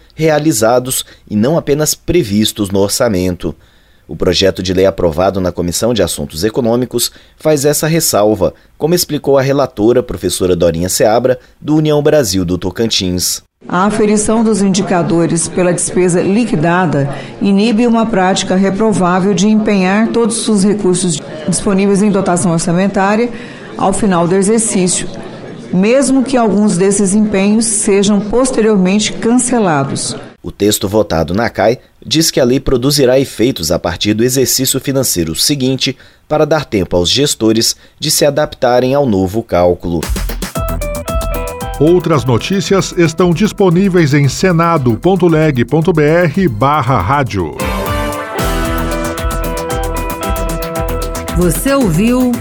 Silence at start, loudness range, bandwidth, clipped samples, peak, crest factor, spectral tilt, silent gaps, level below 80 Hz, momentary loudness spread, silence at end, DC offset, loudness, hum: 0.2 s; 3 LU; 19.5 kHz; under 0.1%; 0 dBFS; 12 dB; -4.5 dB/octave; none; -28 dBFS; 8 LU; 0 s; under 0.1%; -12 LUFS; none